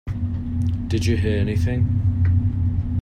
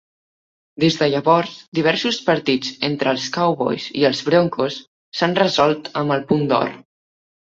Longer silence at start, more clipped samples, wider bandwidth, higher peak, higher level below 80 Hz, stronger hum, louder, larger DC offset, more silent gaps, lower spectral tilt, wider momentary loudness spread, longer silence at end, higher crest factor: second, 0.05 s vs 0.8 s; neither; first, 9.2 kHz vs 7.8 kHz; second, -8 dBFS vs -2 dBFS; first, -32 dBFS vs -60 dBFS; neither; second, -22 LUFS vs -19 LUFS; neither; second, none vs 1.68-1.72 s, 4.87-5.12 s; first, -7.5 dB/octave vs -5.5 dB/octave; about the same, 5 LU vs 7 LU; second, 0 s vs 0.7 s; second, 12 dB vs 18 dB